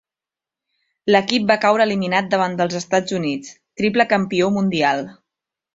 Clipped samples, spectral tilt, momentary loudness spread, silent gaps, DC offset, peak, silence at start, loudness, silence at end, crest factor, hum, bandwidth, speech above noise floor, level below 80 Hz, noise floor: under 0.1%; -5 dB/octave; 9 LU; none; under 0.1%; 0 dBFS; 1.05 s; -18 LUFS; 0.6 s; 20 dB; none; 7.8 kHz; 71 dB; -60 dBFS; -89 dBFS